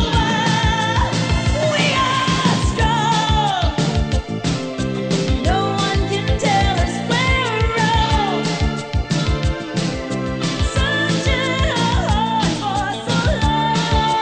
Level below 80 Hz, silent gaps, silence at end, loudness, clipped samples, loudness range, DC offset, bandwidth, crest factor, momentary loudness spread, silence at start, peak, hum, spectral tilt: -26 dBFS; none; 0 s; -18 LUFS; under 0.1%; 3 LU; under 0.1%; 9.6 kHz; 14 dB; 5 LU; 0 s; -4 dBFS; none; -5 dB/octave